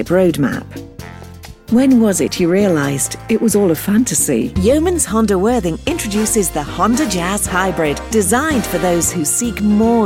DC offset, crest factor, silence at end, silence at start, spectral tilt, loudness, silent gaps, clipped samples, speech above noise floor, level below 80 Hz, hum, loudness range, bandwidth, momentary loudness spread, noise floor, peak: under 0.1%; 12 dB; 0 s; 0 s; -4.5 dB/octave; -15 LUFS; none; under 0.1%; 20 dB; -34 dBFS; none; 2 LU; 17 kHz; 6 LU; -35 dBFS; -4 dBFS